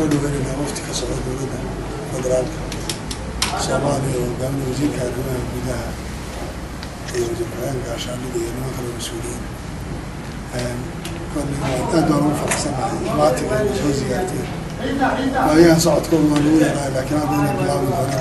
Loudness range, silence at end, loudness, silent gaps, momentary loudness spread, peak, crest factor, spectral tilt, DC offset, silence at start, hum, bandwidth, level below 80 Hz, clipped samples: 9 LU; 0 s; -21 LUFS; none; 13 LU; 0 dBFS; 20 dB; -5.5 dB/octave; under 0.1%; 0 s; none; 12.5 kHz; -34 dBFS; under 0.1%